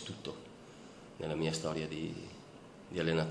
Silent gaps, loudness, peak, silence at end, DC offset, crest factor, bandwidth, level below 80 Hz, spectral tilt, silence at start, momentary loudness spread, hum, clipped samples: none; -38 LUFS; -18 dBFS; 0 s; under 0.1%; 20 dB; 11 kHz; -64 dBFS; -5 dB/octave; 0 s; 19 LU; none; under 0.1%